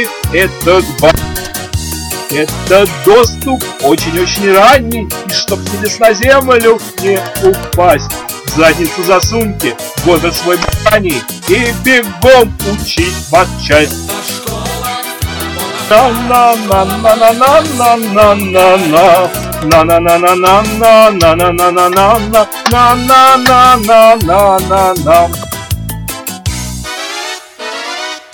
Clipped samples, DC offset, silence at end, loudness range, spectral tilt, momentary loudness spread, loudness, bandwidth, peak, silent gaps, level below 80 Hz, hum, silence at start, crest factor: 5%; under 0.1%; 0.15 s; 5 LU; -4 dB/octave; 13 LU; -9 LUFS; over 20 kHz; 0 dBFS; none; -28 dBFS; none; 0 s; 8 dB